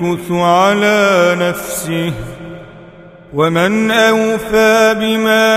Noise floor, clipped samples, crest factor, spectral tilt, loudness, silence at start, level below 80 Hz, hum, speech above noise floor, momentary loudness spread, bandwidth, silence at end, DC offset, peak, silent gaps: -37 dBFS; under 0.1%; 12 dB; -4.5 dB/octave; -12 LUFS; 0 s; -44 dBFS; none; 25 dB; 15 LU; 16 kHz; 0 s; under 0.1%; 0 dBFS; none